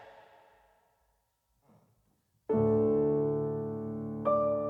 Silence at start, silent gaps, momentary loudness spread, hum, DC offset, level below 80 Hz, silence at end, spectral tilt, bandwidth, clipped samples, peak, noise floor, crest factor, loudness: 0 s; none; 11 LU; none; under 0.1%; -62 dBFS; 0 s; -11.5 dB/octave; 3.8 kHz; under 0.1%; -16 dBFS; -76 dBFS; 16 dB; -30 LUFS